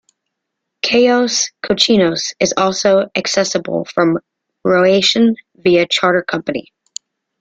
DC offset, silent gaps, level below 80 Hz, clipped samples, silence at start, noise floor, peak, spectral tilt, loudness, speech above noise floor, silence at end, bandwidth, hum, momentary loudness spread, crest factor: under 0.1%; none; -56 dBFS; under 0.1%; 0.85 s; -77 dBFS; 0 dBFS; -3.5 dB/octave; -14 LUFS; 62 dB; 0.8 s; 9.2 kHz; none; 11 LU; 16 dB